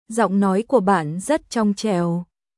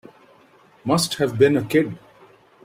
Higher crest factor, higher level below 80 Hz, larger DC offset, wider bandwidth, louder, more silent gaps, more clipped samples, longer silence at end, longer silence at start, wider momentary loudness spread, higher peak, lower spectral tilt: about the same, 16 dB vs 20 dB; about the same, -58 dBFS vs -58 dBFS; neither; second, 12 kHz vs 16 kHz; about the same, -20 LUFS vs -20 LUFS; neither; neither; second, 0.35 s vs 0.65 s; second, 0.1 s vs 0.85 s; second, 5 LU vs 14 LU; about the same, -4 dBFS vs -4 dBFS; about the same, -6 dB/octave vs -5 dB/octave